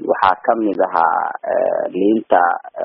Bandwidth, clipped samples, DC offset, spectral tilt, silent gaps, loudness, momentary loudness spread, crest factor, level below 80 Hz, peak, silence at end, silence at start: 5.6 kHz; under 0.1%; under 0.1%; -3.5 dB/octave; none; -17 LUFS; 4 LU; 16 dB; -62 dBFS; 0 dBFS; 0 s; 0 s